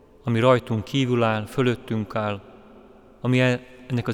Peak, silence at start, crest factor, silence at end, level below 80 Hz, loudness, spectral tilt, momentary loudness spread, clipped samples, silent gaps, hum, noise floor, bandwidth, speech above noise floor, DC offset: -4 dBFS; 0.25 s; 20 dB; 0 s; -56 dBFS; -23 LUFS; -7 dB/octave; 10 LU; under 0.1%; none; none; -49 dBFS; 13.5 kHz; 27 dB; under 0.1%